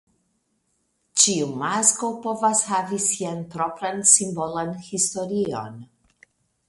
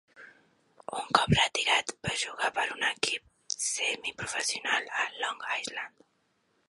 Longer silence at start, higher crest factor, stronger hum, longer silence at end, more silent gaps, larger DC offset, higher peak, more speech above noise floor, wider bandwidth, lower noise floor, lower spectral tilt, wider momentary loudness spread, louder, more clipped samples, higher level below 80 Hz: first, 1.15 s vs 0.15 s; about the same, 24 dB vs 26 dB; neither; about the same, 0.85 s vs 0.8 s; neither; neither; first, 0 dBFS vs -6 dBFS; first, 47 dB vs 43 dB; about the same, 12 kHz vs 11.5 kHz; about the same, -71 dBFS vs -73 dBFS; about the same, -2.5 dB/octave vs -2 dB/octave; about the same, 12 LU vs 13 LU; first, -21 LUFS vs -29 LUFS; neither; second, -66 dBFS vs -56 dBFS